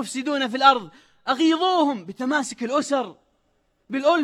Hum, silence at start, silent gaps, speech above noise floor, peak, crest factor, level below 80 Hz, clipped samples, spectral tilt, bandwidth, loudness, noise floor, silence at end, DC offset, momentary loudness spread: none; 0 s; none; 46 dB; -2 dBFS; 22 dB; -70 dBFS; under 0.1%; -3 dB/octave; 12.5 kHz; -22 LUFS; -68 dBFS; 0 s; under 0.1%; 11 LU